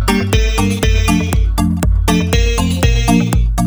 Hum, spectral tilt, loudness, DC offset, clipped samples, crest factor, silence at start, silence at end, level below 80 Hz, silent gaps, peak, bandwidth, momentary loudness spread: none; -5.5 dB/octave; -14 LUFS; under 0.1%; under 0.1%; 12 dB; 0 s; 0 s; -16 dBFS; none; 0 dBFS; over 20 kHz; 2 LU